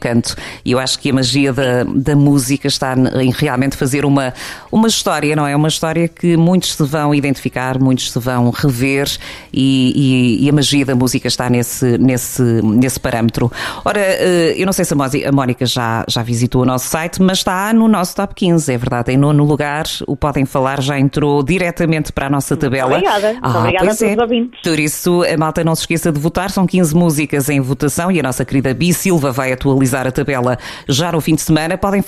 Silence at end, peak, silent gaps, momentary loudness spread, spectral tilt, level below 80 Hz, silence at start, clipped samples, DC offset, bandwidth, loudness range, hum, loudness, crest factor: 0 s; -2 dBFS; none; 5 LU; -5 dB/octave; -38 dBFS; 0 s; under 0.1%; under 0.1%; 15.5 kHz; 1 LU; none; -14 LUFS; 12 dB